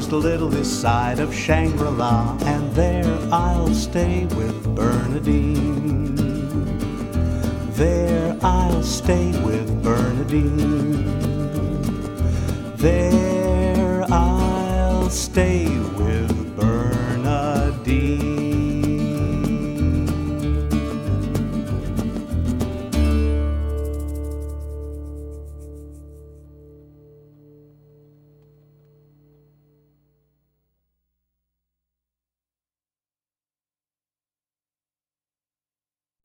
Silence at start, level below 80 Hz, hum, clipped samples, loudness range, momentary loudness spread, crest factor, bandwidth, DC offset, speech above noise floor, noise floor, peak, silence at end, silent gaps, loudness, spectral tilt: 0 s; -28 dBFS; none; under 0.1%; 6 LU; 7 LU; 18 dB; 16.5 kHz; under 0.1%; over 71 dB; under -90 dBFS; -4 dBFS; 9.5 s; none; -21 LUFS; -6.5 dB/octave